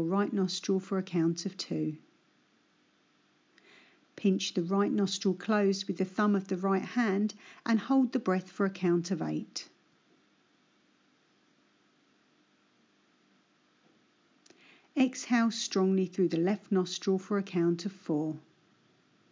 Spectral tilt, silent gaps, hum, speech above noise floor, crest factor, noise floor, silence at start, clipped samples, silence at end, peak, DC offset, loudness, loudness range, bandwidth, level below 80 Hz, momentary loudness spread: -5.5 dB/octave; none; none; 39 dB; 16 dB; -69 dBFS; 0 s; under 0.1%; 0.9 s; -16 dBFS; under 0.1%; -31 LUFS; 8 LU; 7.6 kHz; under -90 dBFS; 7 LU